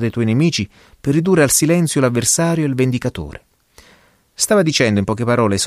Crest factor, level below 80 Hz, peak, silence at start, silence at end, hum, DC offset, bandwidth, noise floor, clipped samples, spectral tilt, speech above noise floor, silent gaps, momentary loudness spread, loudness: 16 dB; -46 dBFS; -2 dBFS; 0 s; 0 s; none; under 0.1%; 15.5 kHz; -52 dBFS; under 0.1%; -4.5 dB/octave; 36 dB; none; 11 LU; -16 LUFS